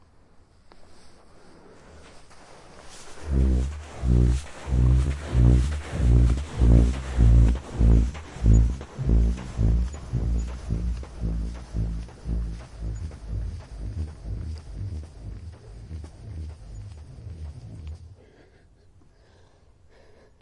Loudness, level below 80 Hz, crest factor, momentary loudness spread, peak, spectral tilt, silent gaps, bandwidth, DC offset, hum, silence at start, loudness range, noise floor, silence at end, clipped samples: -25 LUFS; -26 dBFS; 20 dB; 20 LU; -6 dBFS; -8 dB/octave; none; 10.5 kHz; under 0.1%; none; 0.75 s; 20 LU; -55 dBFS; 2.3 s; under 0.1%